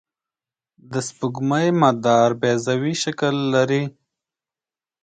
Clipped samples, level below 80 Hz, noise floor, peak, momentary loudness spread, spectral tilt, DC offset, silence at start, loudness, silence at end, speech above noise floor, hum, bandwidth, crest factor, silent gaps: under 0.1%; -64 dBFS; under -90 dBFS; -2 dBFS; 11 LU; -5.5 dB/octave; under 0.1%; 0.9 s; -20 LUFS; 1.15 s; over 71 dB; none; 9.4 kHz; 20 dB; none